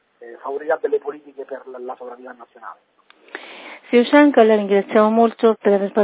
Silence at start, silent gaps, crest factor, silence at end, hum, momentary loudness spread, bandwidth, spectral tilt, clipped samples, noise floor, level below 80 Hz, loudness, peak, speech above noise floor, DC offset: 0.2 s; none; 18 dB; 0 s; none; 24 LU; 4 kHz; -10 dB/octave; under 0.1%; -38 dBFS; -72 dBFS; -16 LUFS; 0 dBFS; 21 dB; under 0.1%